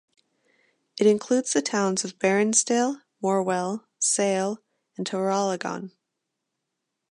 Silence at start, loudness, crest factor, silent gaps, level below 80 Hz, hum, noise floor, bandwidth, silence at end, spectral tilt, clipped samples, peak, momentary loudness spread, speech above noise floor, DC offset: 0.95 s; -24 LUFS; 18 dB; none; -78 dBFS; none; -82 dBFS; 11.5 kHz; 1.2 s; -3.5 dB/octave; under 0.1%; -8 dBFS; 14 LU; 58 dB; under 0.1%